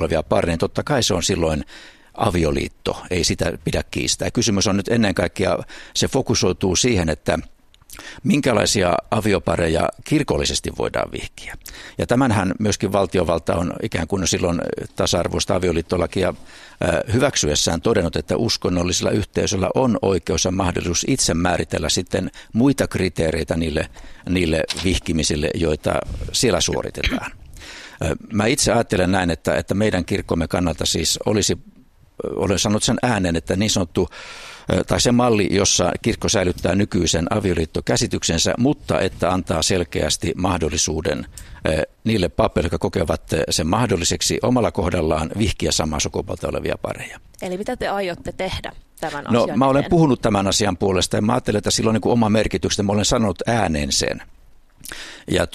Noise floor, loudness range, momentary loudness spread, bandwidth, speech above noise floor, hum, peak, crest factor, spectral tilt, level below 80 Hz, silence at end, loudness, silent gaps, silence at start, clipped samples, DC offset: -47 dBFS; 3 LU; 9 LU; 14.5 kHz; 27 dB; none; 0 dBFS; 20 dB; -4 dB/octave; -38 dBFS; 0.05 s; -20 LUFS; none; 0 s; under 0.1%; under 0.1%